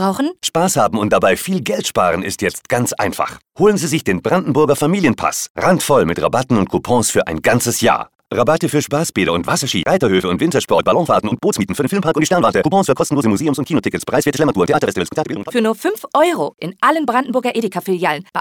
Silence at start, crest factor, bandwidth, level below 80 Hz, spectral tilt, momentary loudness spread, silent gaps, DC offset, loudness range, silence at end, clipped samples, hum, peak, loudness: 0 s; 12 dB; 19 kHz; -48 dBFS; -4.5 dB/octave; 5 LU; 5.50-5.55 s; 0.2%; 2 LU; 0 s; under 0.1%; none; -2 dBFS; -16 LUFS